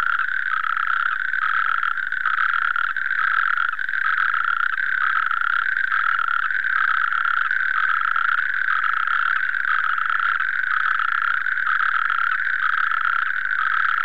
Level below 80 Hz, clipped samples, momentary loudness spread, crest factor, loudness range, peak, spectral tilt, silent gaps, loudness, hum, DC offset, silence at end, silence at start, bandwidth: -68 dBFS; under 0.1%; 2 LU; 14 dB; 1 LU; -8 dBFS; 0 dB/octave; none; -20 LUFS; none; 3%; 0 s; 0 s; 7 kHz